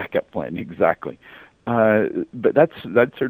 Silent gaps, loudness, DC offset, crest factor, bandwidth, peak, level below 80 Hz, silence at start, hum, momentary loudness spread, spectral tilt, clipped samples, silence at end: none; -20 LUFS; under 0.1%; 20 dB; 15.5 kHz; 0 dBFS; -58 dBFS; 0 s; none; 12 LU; -9.5 dB/octave; under 0.1%; 0 s